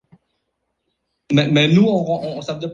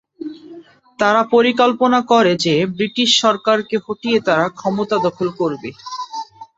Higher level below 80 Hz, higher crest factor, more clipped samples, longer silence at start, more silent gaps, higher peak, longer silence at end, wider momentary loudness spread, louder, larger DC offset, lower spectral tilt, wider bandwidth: about the same, -56 dBFS vs -60 dBFS; about the same, 16 dB vs 16 dB; neither; first, 1.3 s vs 0.2 s; neither; about the same, -2 dBFS vs -2 dBFS; second, 0 s vs 0.15 s; second, 12 LU vs 16 LU; about the same, -17 LUFS vs -16 LUFS; neither; first, -6.5 dB/octave vs -4 dB/octave; about the same, 7.4 kHz vs 8 kHz